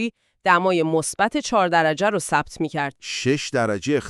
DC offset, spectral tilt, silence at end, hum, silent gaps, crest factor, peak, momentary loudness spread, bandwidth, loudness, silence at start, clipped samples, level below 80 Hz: under 0.1%; -4.5 dB/octave; 0 s; none; none; 18 dB; -4 dBFS; 8 LU; 13.5 kHz; -21 LUFS; 0 s; under 0.1%; -56 dBFS